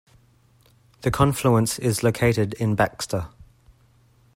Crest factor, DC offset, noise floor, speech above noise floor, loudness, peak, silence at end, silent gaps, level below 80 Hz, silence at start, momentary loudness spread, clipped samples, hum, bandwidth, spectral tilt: 22 dB; under 0.1%; -58 dBFS; 37 dB; -22 LUFS; -2 dBFS; 1.1 s; none; -46 dBFS; 1.05 s; 9 LU; under 0.1%; none; 16.5 kHz; -5.5 dB/octave